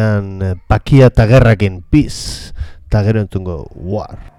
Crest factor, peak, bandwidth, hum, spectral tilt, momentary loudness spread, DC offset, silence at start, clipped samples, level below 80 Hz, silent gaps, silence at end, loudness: 12 dB; 0 dBFS; 12 kHz; none; -7.5 dB/octave; 17 LU; under 0.1%; 0 s; 0.7%; -26 dBFS; none; 0.1 s; -13 LUFS